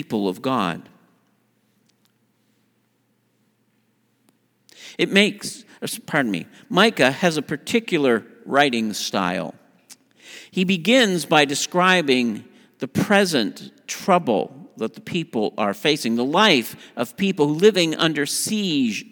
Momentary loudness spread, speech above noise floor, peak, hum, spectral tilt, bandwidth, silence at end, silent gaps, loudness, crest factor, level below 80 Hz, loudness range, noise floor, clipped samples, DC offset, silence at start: 14 LU; 46 dB; 0 dBFS; none; -4 dB/octave; over 20 kHz; 0.1 s; none; -20 LUFS; 22 dB; -68 dBFS; 6 LU; -66 dBFS; under 0.1%; under 0.1%; 0 s